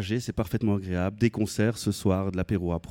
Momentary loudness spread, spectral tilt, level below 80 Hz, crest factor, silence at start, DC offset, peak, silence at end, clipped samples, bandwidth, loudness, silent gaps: 3 LU; -6.5 dB/octave; -48 dBFS; 16 dB; 0 s; under 0.1%; -10 dBFS; 0 s; under 0.1%; 17 kHz; -28 LUFS; none